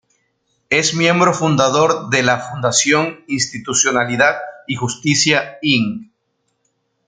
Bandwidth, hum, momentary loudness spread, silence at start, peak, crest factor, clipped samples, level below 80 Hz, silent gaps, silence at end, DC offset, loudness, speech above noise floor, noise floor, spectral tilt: 10.5 kHz; none; 9 LU; 0.7 s; 0 dBFS; 16 dB; under 0.1%; -58 dBFS; none; 1.05 s; under 0.1%; -15 LUFS; 52 dB; -69 dBFS; -3 dB/octave